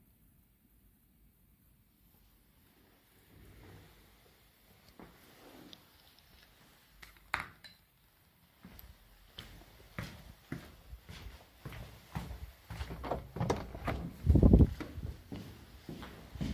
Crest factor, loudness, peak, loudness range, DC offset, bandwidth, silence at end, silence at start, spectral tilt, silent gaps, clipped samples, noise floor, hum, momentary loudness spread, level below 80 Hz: 28 dB; -35 LUFS; -10 dBFS; 26 LU; under 0.1%; 16 kHz; 0 s; 3.7 s; -7.5 dB/octave; none; under 0.1%; -67 dBFS; none; 26 LU; -42 dBFS